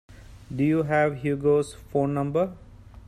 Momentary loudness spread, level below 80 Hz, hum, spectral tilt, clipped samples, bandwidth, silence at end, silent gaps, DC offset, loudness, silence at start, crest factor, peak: 6 LU; -50 dBFS; none; -8 dB/octave; under 0.1%; 14 kHz; 0.1 s; none; under 0.1%; -25 LUFS; 0.1 s; 14 dB; -10 dBFS